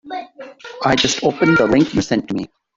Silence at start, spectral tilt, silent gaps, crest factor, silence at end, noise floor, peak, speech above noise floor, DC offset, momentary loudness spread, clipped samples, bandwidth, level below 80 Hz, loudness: 0.05 s; -4.5 dB/octave; none; 16 dB; 0.3 s; -36 dBFS; -2 dBFS; 21 dB; under 0.1%; 20 LU; under 0.1%; 7.8 kHz; -48 dBFS; -16 LUFS